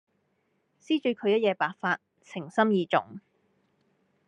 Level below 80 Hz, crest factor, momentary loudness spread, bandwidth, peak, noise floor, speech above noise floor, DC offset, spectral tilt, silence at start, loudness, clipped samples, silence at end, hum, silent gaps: -82 dBFS; 20 dB; 12 LU; 9.6 kHz; -8 dBFS; -74 dBFS; 47 dB; under 0.1%; -6.5 dB/octave; 0.9 s; -27 LUFS; under 0.1%; 1.1 s; none; none